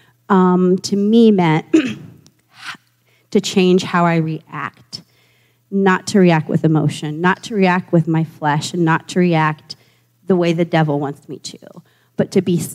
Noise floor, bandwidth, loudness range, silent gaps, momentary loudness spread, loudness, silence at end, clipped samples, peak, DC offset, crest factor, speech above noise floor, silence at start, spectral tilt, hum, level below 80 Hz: -58 dBFS; 14.5 kHz; 3 LU; none; 19 LU; -16 LUFS; 0 s; under 0.1%; -2 dBFS; under 0.1%; 14 dB; 43 dB; 0.3 s; -6.5 dB/octave; none; -66 dBFS